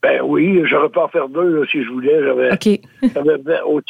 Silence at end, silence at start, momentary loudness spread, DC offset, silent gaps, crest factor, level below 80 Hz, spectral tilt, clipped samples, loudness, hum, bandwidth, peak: 0.1 s; 0.05 s; 4 LU; under 0.1%; none; 12 dB; -58 dBFS; -6.5 dB/octave; under 0.1%; -16 LUFS; none; 11.5 kHz; -4 dBFS